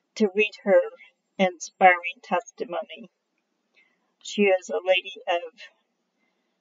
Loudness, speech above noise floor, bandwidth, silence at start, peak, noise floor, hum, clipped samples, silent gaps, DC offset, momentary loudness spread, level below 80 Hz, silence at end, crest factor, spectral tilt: -24 LUFS; 52 dB; 7.6 kHz; 0.15 s; -4 dBFS; -76 dBFS; none; under 0.1%; none; under 0.1%; 20 LU; -86 dBFS; 0.95 s; 22 dB; -2.5 dB/octave